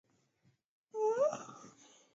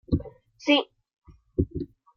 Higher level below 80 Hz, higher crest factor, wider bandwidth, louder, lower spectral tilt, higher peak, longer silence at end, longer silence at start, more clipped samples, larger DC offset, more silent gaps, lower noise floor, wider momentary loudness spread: second, under -90 dBFS vs -44 dBFS; about the same, 18 dB vs 22 dB; first, 7.6 kHz vs 6.8 kHz; second, -35 LUFS vs -27 LUFS; second, -4 dB/octave vs -6 dB/octave; second, -22 dBFS vs -8 dBFS; first, 0.45 s vs 0.3 s; first, 0.95 s vs 0.1 s; neither; neither; second, none vs 1.18-1.22 s; first, -75 dBFS vs -43 dBFS; first, 20 LU vs 17 LU